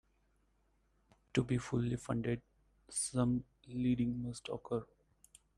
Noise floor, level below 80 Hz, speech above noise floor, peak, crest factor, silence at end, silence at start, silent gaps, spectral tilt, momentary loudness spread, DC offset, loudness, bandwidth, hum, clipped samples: -75 dBFS; -62 dBFS; 39 dB; -18 dBFS; 22 dB; 0.75 s; 1.35 s; none; -6 dB/octave; 8 LU; under 0.1%; -38 LUFS; 12.5 kHz; none; under 0.1%